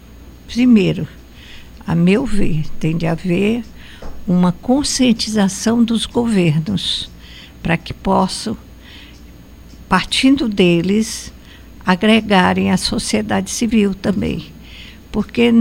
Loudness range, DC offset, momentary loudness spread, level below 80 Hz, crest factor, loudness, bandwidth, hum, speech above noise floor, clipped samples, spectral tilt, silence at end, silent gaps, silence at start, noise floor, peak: 4 LU; under 0.1%; 16 LU; -34 dBFS; 16 dB; -16 LUFS; 16 kHz; none; 24 dB; under 0.1%; -5 dB/octave; 0 s; none; 0.1 s; -39 dBFS; 0 dBFS